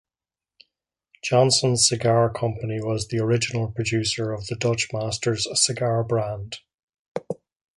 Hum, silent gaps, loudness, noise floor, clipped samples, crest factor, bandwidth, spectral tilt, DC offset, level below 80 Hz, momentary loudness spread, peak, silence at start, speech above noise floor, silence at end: none; 6.74-6.88 s, 6.99-7.15 s; -23 LUFS; under -90 dBFS; under 0.1%; 20 dB; 11.5 kHz; -4 dB/octave; under 0.1%; -52 dBFS; 15 LU; -4 dBFS; 1.25 s; over 67 dB; 0.45 s